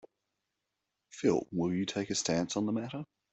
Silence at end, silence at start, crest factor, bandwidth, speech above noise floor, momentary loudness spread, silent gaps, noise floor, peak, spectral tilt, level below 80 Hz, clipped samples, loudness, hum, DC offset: 0.3 s; 1.15 s; 20 dB; 8.4 kHz; 54 dB; 10 LU; none; -86 dBFS; -16 dBFS; -4.5 dB/octave; -68 dBFS; under 0.1%; -33 LUFS; none; under 0.1%